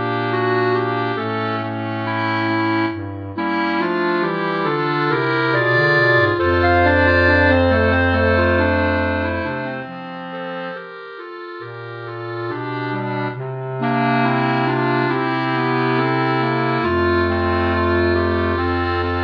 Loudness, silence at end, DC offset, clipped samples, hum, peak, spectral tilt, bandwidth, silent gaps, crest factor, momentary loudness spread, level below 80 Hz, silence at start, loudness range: -18 LUFS; 0 s; under 0.1%; under 0.1%; none; -2 dBFS; -8.5 dB/octave; 5.4 kHz; none; 16 dB; 14 LU; -38 dBFS; 0 s; 12 LU